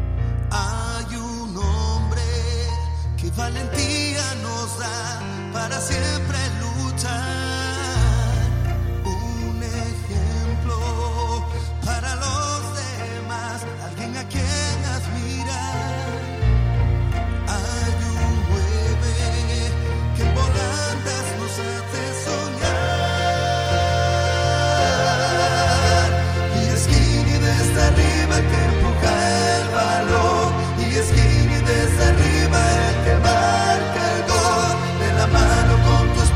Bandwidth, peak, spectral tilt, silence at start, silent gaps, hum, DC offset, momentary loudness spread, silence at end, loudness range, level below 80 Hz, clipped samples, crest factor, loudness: 15 kHz; -2 dBFS; -5 dB/octave; 0 s; none; none; under 0.1%; 9 LU; 0 s; 7 LU; -26 dBFS; under 0.1%; 16 dB; -20 LUFS